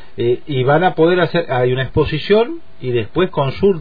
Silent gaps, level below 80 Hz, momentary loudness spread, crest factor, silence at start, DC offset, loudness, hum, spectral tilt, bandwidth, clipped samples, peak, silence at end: none; -40 dBFS; 7 LU; 14 dB; 0.15 s; 4%; -16 LUFS; none; -9.5 dB/octave; 5 kHz; under 0.1%; -2 dBFS; 0 s